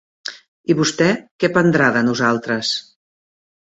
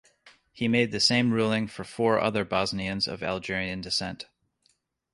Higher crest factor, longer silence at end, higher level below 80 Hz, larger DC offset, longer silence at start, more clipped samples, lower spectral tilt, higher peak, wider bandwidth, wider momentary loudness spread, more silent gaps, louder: about the same, 18 dB vs 20 dB; about the same, 0.95 s vs 0.9 s; about the same, -58 dBFS vs -56 dBFS; neither; about the same, 0.25 s vs 0.25 s; neither; about the same, -4.5 dB/octave vs -4.5 dB/octave; first, -2 dBFS vs -8 dBFS; second, 8.2 kHz vs 11.5 kHz; first, 16 LU vs 10 LU; first, 0.48-0.64 s, 1.31-1.39 s vs none; first, -17 LUFS vs -26 LUFS